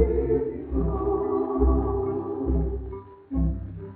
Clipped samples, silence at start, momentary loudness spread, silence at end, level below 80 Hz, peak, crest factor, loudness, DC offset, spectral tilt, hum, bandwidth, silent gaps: under 0.1%; 0 s; 11 LU; 0 s; -30 dBFS; -8 dBFS; 16 dB; -27 LUFS; under 0.1%; -12 dB/octave; none; 2.6 kHz; none